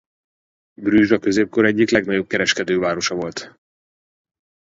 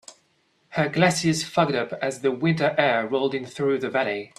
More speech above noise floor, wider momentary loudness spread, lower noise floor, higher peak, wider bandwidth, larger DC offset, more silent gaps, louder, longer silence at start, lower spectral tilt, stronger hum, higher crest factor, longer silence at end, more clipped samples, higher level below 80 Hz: first, over 72 dB vs 43 dB; first, 11 LU vs 6 LU; first, under -90 dBFS vs -66 dBFS; first, 0 dBFS vs -4 dBFS; second, 7.8 kHz vs 13.5 kHz; neither; neither; first, -18 LUFS vs -23 LUFS; first, 0.8 s vs 0.1 s; about the same, -4.5 dB/octave vs -5 dB/octave; neither; about the same, 20 dB vs 20 dB; first, 1.3 s vs 0.1 s; neither; first, -54 dBFS vs -64 dBFS